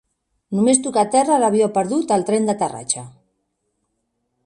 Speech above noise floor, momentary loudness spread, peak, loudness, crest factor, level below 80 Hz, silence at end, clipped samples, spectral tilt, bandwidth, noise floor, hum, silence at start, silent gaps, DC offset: 55 dB; 8 LU; 0 dBFS; -18 LUFS; 20 dB; -64 dBFS; 1.35 s; under 0.1%; -4.5 dB/octave; 11.5 kHz; -73 dBFS; none; 0.5 s; none; under 0.1%